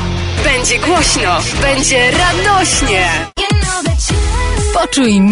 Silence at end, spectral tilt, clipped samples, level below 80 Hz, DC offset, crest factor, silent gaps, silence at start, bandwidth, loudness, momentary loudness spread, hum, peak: 0 s; -3.5 dB/octave; under 0.1%; -20 dBFS; under 0.1%; 10 dB; none; 0 s; 11 kHz; -12 LUFS; 5 LU; none; -2 dBFS